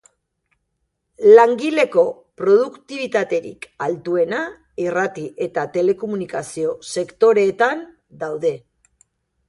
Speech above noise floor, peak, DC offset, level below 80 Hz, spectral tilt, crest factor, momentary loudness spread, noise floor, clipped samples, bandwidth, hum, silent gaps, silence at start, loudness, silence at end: 55 dB; 0 dBFS; under 0.1%; -64 dBFS; -5 dB/octave; 18 dB; 13 LU; -73 dBFS; under 0.1%; 11.5 kHz; none; none; 1.2 s; -19 LUFS; 0.9 s